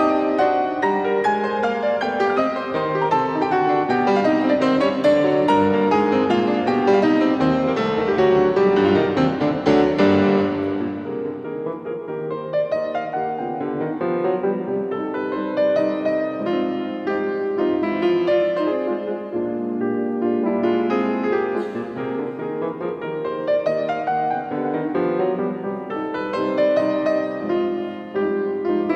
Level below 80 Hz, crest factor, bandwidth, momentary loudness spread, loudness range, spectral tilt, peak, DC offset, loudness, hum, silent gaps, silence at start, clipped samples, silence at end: -56 dBFS; 16 dB; 8.4 kHz; 9 LU; 6 LU; -7.5 dB/octave; -4 dBFS; under 0.1%; -21 LUFS; none; none; 0 s; under 0.1%; 0 s